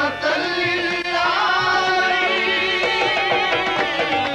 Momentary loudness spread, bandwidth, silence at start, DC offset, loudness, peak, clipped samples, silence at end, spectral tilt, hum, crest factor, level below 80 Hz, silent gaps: 3 LU; 13 kHz; 0 s; under 0.1%; -18 LUFS; -6 dBFS; under 0.1%; 0 s; -3 dB/octave; none; 12 dB; -52 dBFS; none